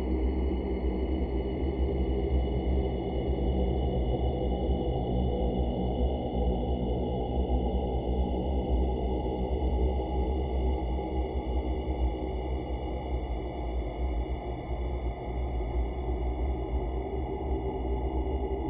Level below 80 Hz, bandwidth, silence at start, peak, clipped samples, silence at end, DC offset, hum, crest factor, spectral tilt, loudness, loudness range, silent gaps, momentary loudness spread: -32 dBFS; 3.8 kHz; 0 s; -16 dBFS; under 0.1%; 0 s; under 0.1%; none; 12 dB; -11.5 dB/octave; -31 LUFS; 4 LU; none; 5 LU